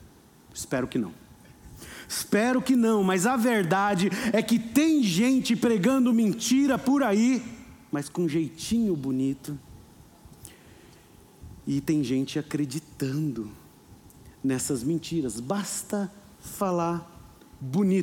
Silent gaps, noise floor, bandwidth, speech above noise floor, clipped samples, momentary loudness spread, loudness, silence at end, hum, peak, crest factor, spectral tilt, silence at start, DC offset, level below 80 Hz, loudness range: none; -53 dBFS; 18 kHz; 28 dB; under 0.1%; 15 LU; -26 LUFS; 0 s; none; -10 dBFS; 16 dB; -5 dB/octave; 0.55 s; under 0.1%; -58 dBFS; 9 LU